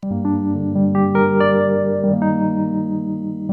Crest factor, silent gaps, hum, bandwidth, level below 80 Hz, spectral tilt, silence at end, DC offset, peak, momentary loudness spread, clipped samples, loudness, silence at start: 14 dB; none; 50 Hz at -45 dBFS; 4.3 kHz; -58 dBFS; -11 dB/octave; 0 s; under 0.1%; -4 dBFS; 7 LU; under 0.1%; -18 LUFS; 0 s